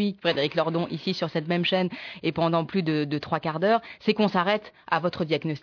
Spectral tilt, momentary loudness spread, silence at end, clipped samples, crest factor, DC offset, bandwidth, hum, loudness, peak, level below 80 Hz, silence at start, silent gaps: -7 dB/octave; 5 LU; 0.05 s; under 0.1%; 18 dB; under 0.1%; 5.4 kHz; none; -26 LUFS; -8 dBFS; -66 dBFS; 0 s; none